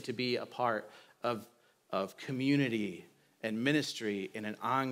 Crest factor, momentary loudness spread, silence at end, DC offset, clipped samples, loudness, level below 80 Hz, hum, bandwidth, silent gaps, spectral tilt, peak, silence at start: 18 dB; 10 LU; 0 s; under 0.1%; under 0.1%; -35 LUFS; -88 dBFS; none; 16 kHz; none; -5.5 dB/octave; -16 dBFS; 0 s